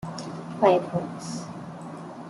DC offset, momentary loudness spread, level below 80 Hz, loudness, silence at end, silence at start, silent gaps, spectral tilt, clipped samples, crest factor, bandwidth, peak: under 0.1%; 17 LU; -66 dBFS; -26 LUFS; 0 s; 0 s; none; -6 dB/octave; under 0.1%; 22 dB; 12 kHz; -6 dBFS